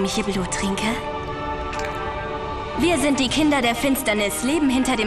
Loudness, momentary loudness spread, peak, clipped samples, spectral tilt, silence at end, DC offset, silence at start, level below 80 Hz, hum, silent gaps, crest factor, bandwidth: -22 LUFS; 9 LU; -8 dBFS; under 0.1%; -4 dB/octave; 0 s; under 0.1%; 0 s; -38 dBFS; none; none; 14 dB; 14 kHz